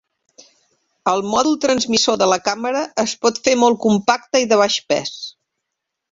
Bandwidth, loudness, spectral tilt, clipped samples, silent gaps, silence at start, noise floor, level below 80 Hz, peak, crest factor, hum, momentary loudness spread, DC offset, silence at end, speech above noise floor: 7.8 kHz; -17 LUFS; -3 dB/octave; under 0.1%; none; 1.05 s; -79 dBFS; -60 dBFS; -2 dBFS; 18 dB; none; 7 LU; under 0.1%; 0.8 s; 62 dB